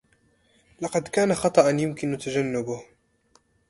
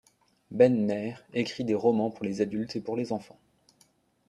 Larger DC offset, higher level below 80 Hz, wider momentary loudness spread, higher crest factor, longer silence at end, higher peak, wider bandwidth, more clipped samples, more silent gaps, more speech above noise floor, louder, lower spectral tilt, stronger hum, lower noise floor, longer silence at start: neither; first, -60 dBFS vs -70 dBFS; about the same, 13 LU vs 11 LU; about the same, 22 dB vs 20 dB; second, 0.85 s vs 1.05 s; first, -4 dBFS vs -8 dBFS; about the same, 11.5 kHz vs 11 kHz; neither; neither; about the same, 41 dB vs 39 dB; first, -24 LUFS vs -28 LUFS; second, -5.5 dB/octave vs -7 dB/octave; neither; about the same, -64 dBFS vs -66 dBFS; first, 0.8 s vs 0.5 s